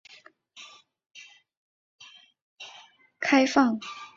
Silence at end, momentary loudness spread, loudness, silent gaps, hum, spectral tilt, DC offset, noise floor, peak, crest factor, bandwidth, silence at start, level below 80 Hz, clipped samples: 0.1 s; 27 LU; -24 LUFS; 1.57-1.99 s, 2.42-2.56 s; none; -3.5 dB/octave; under 0.1%; -55 dBFS; -6 dBFS; 24 dB; 7.6 kHz; 0.55 s; -74 dBFS; under 0.1%